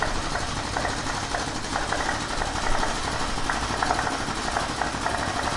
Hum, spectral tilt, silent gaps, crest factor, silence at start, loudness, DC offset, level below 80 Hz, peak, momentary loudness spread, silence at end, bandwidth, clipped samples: none; -3 dB/octave; none; 20 dB; 0 s; -27 LUFS; under 0.1%; -36 dBFS; -6 dBFS; 3 LU; 0 s; 11.5 kHz; under 0.1%